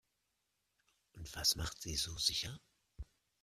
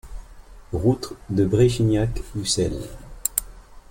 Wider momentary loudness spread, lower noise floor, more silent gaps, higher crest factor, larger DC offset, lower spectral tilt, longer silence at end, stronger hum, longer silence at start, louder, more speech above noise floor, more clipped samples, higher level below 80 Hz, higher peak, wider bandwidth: first, 22 LU vs 10 LU; first, -84 dBFS vs -43 dBFS; neither; about the same, 26 dB vs 22 dB; neither; second, -1.5 dB/octave vs -5.5 dB/octave; first, 0.4 s vs 0.1 s; neither; first, 1.15 s vs 0.05 s; second, -36 LUFS vs -23 LUFS; first, 45 dB vs 22 dB; neither; second, -56 dBFS vs -38 dBFS; second, -18 dBFS vs -2 dBFS; about the same, 15.5 kHz vs 17 kHz